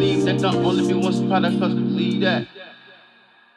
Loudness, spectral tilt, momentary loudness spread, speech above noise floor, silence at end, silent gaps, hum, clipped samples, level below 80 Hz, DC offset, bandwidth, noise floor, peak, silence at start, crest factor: -20 LUFS; -6.5 dB/octave; 10 LU; 33 dB; 0.8 s; none; none; under 0.1%; -56 dBFS; under 0.1%; 11 kHz; -53 dBFS; -6 dBFS; 0 s; 14 dB